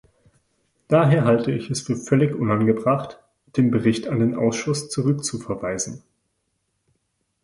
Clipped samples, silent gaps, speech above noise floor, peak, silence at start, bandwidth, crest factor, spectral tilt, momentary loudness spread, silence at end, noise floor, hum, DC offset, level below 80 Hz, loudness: under 0.1%; none; 53 dB; -4 dBFS; 0.9 s; 11.5 kHz; 18 dB; -6 dB/octave; 10 LU; 1.45 s; -73 dBFS; none; under 0.1%; -56 dBFS; -21 LUFS